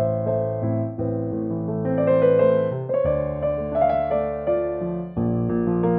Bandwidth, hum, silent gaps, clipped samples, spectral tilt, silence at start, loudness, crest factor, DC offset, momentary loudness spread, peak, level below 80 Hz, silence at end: 4 kHz; none; none; under 0.1%; -13 dB/octave; 0 s; -23 LUFS; 16 dB; under 0.1%; 8 LU; -6 dBFS; -44 dBFS; 0 s